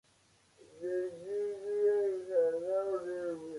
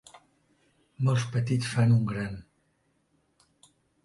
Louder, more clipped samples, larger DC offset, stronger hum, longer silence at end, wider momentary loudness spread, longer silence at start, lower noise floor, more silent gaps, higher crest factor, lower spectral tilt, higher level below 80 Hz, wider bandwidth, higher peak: second, -34 LUFS vs -27 LUFS; neither; neither; neither; second, 0 s vs 1.6 s; second, 8 LU vs 12 LU; first, 0.7 s vs 0.15 s; second, -68 dBFS vs -72 dBFS; neither; about the same, 14 dB vs 18 dB; about the same, -6 dB/octave vs -6.5 dB/octave; second, -80 dBFS vs -60 dBFS; about the same, 11.5 kHz vs 11.5 kHz; second, -20 dBFS vs -12 dBFS